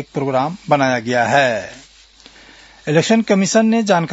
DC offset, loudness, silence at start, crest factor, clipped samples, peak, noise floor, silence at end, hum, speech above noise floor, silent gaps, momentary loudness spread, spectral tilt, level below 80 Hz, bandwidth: under 0.1%; -16 LUFS; 0 s; 16 dB; under 0.1%; 0 dBFS; -46 dBFS; 0 s; none; 30 dB; none; 7 LU; -5 dB/octave; -58 dBFS; 8 kHz